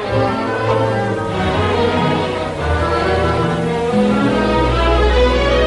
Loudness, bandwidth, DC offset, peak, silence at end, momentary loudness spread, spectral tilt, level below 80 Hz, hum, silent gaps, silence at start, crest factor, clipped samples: -16 LUFS; 11.5 kHz; under 0.1%; -2 dBFS; 0 s; 5 LU; -6.5 dB/octave; -24 dBFS; none; none; 0 s; 12 dB; under 0.1%